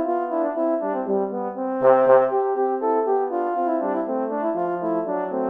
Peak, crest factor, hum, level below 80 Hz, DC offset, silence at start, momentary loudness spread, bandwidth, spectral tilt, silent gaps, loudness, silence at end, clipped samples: -2 dBFS; 18 dB; none; -70 dBFS; under 0.1%; 0 s; 8 LU; 3.6 kHz; -10 dB/octave; none; -22 LUFS; 0 s; under 0.1%